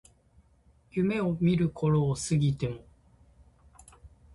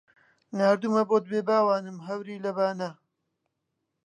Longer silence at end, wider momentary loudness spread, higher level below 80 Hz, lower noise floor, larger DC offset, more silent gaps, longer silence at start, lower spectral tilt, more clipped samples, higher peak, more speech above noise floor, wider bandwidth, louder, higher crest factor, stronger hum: second, 0.25 s vs 1.1 s; second, 9 LU vs 12 LU; first, -54 dBFS vs -82 dBFS; second, -63 dBFS vs -81 dBFS; neither; neither; first, 0.95 s vs 0.5 s; about the same, -7 dB/octave vs -6.5 dB/octave; neither; second, -14 dBFS vs -10 dBFS; second, 36 dB vs 55 dB; first, 11.5 kHz vs 10 kHz; about the same, -28 LUFS vs -26 LUFS; about the same, 16 dB vs 18 dB; neither